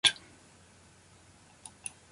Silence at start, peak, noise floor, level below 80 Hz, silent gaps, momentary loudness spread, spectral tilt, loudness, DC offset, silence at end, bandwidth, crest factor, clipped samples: 0.05 s; -8 dBFS; -59 dBFS; -68 dBFS; none; 17 LU; 1 dB/octave; -34 LUFS; under 0.1%; 1.95 s; 11.5 kHz; 30 dB; under 0.1%